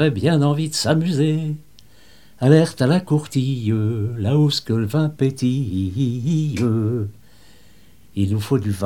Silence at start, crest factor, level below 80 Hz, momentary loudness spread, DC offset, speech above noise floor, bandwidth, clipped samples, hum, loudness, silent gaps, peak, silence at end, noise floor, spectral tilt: 0 s; 18 dB; -54 dBFS; 7 LU; 0.5%; 33 dB; 15 kHz; under 0.1%; none; -20 LUFS; none; 0 dBFS; 0 s; -52 dBFS; -6.5 dB/octave